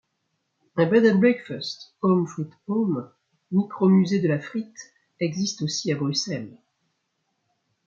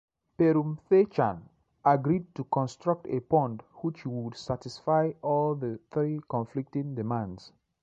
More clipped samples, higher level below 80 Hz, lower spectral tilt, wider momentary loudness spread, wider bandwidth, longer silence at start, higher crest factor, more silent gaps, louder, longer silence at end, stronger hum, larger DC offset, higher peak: neither; second, -70 dBFS vs -62 dBFS; second, -6 dB/octave vs -8.5 dB/octave; first, 15 LU vs 11 LU; about the same, 7.4 kHz vs 8 kHz; first, 0.75 s vs 0.4 s; about the same, 18 dB vs 18 dB; neither; first, -24 LUFS vs -29 LUFS; first, 1.35 s vs 0.35 s; neither; neither; first, -6 dBFS vs -10 dBFS